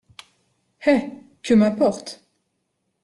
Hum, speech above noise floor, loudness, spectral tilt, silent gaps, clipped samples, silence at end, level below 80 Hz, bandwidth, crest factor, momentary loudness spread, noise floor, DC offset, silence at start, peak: none; 55 dB; -20 LUFS; -6 dB/octave; none; under 0.1%; 0.9 s; -60 dBFS; 11.5 kHz; 18 dB; 19 LU; -74 dBFS; under 0.1%; 0.8 s; -6 dBFS